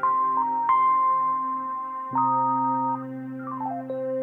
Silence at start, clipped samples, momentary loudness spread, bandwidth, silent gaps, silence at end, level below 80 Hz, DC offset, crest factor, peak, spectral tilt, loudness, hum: 0 s; under 0.1%; 11 LU; 3.4 kHz; none; 0 s; -76 dBFS; under 0.1%; 12 dB; -12 dBFS; -9.5 dB/octave; -24 LUFS; none